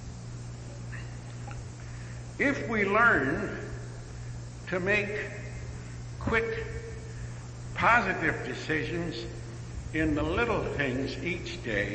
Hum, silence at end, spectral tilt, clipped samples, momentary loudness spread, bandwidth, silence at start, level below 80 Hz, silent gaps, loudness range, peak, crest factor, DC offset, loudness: none; 0 s; -5.5 dB/octave; under 0.1%; 18 LU; 8.8 kHz; 0 s; -46 dBFS; none; 4 LU; -10 dBFS; 20 dB; under 0.1%; -29 LUFS